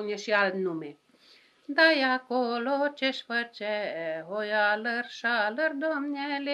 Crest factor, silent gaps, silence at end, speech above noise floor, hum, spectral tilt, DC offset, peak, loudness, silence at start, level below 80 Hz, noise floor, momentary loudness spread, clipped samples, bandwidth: 22 dB; none; 0 s; 31 dB; none; -4 dB/octave; under 0.1%; -6 dBFS; -28 LUFS; 0 s; under -90 dBFS; -59 dBFS; 11 LU; under 0.1%; 11.5 kHz